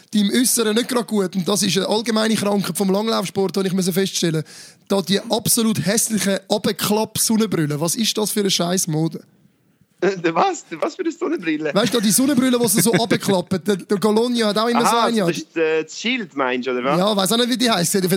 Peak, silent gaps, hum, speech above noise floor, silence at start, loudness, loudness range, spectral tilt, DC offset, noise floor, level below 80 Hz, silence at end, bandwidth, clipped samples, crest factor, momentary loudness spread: -2 dBFS; none; none; 40 dB; 0.1 s; -19 LUFS; 3 LU; -4 dB/octave; under 0.1%; -59 dBFS; -64 dBFS; 0 s; 17 kHz; under 0.1%; 16 dB; 6 LU